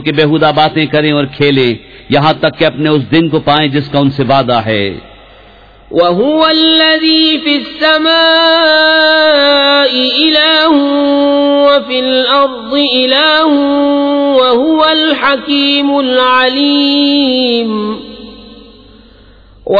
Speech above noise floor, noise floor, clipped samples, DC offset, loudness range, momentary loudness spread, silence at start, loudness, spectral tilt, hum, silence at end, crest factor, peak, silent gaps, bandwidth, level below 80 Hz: 30 dB; -39 dBFS; under 0.1%; under 0.1%; 5 LU; 6 LU; 0 s; -9 LUFS; -7 dB/octave; none; 0 s; 10 dB; 0 dBFS; none; 5 kHz; -44 dBFS